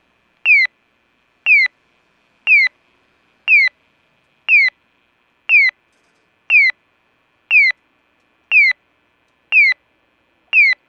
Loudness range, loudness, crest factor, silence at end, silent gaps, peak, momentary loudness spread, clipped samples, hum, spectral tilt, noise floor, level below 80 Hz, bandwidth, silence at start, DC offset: 0 LU; -12 LUFS; 14 dB; 0.15 s; none; -4 dBFS; 12 LU; under 0.1%; none; 2 dB/octave; -61 dBFS; -78 dBFS; 7.4 kHz; 0.45 s; under 0.1%